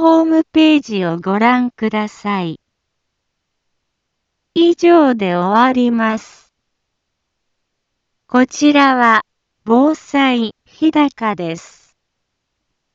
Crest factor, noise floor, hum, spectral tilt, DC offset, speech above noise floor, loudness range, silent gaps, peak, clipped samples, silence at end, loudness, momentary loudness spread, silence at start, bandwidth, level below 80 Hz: 16 dB; -73 dBFS; none; -5.5 dB/octave; under 0.1%; 60 dB; 5 LU; none; 0 dBFS; under 0.1%; 1.35 s; -14 LUFS; 11 LU; 0 s; 7.8 kHz; -60 dBFS